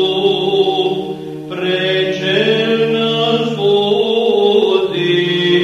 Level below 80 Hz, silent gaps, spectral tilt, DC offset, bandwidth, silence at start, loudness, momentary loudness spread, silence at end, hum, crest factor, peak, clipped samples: -56 dBFS; none; -6 dB/octave; under 0.1%; 9.8 kHz; 0 s; -14 LUFS; 6 LU; 0 s; none; 12 dB; -2 dBFS; under 0.1%